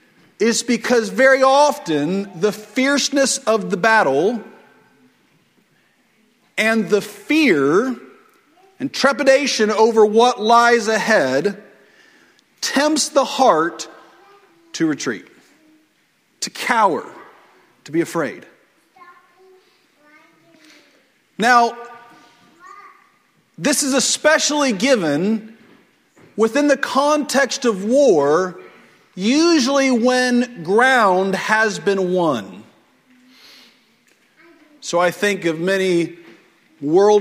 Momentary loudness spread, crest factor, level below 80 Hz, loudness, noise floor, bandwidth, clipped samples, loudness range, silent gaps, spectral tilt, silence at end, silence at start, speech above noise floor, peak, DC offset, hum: 13 LU; 18 dB; -68 dBFS; -17 LUFS; -61 dBFS; 16 kHz; under 0.1%; 8 LU; none; -3.5 dB/octave; 0 s; 0.4 s; 45 dB; 0 dBFS; under 0.1%; none